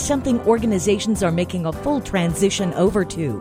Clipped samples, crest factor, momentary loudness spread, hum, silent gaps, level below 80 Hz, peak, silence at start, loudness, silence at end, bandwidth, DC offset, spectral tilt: under 0.1%; 14 dB; 5 LU; none; none; -40 dBFS; -4 dBFS; 0 s; -20 LUFS; 0 s; 16 kHz; under 0.1%; -5.5 dB/octave